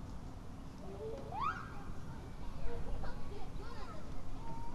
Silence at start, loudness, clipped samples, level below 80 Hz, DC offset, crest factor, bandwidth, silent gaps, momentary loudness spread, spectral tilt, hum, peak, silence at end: 0 s; -46 LUFS; under 0.1%; -46 dBFS; under 0.1%; 16 dB; 8 kHz; none; 10 LU; -6.5 dB/octave; none; -22 dBFS; 0 s